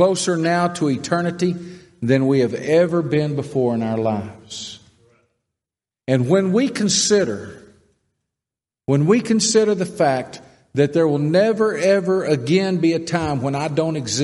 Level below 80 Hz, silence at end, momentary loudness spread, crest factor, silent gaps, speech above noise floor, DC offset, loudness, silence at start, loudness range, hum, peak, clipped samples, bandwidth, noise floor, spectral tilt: -58 dBFS; 0 s; 12 LU; 16 dB; none; 71 dB; under 0.1%; -19 LUFS; 0 s; 4 LU; none; -2 dBFS; under 0.1%; 11.5 kHz; -89 dBFS; -5 dB/octave